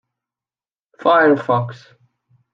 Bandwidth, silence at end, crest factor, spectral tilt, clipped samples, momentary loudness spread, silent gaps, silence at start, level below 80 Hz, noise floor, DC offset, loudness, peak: 7.2 kHz; 0.75 s; 18 dB; -8 dB/octave; under 0.1%; 9 LU; none; 1 s; -72 dBFS; under -90 dBFS; under 0.1%; -16 LUFS; -2 dBFS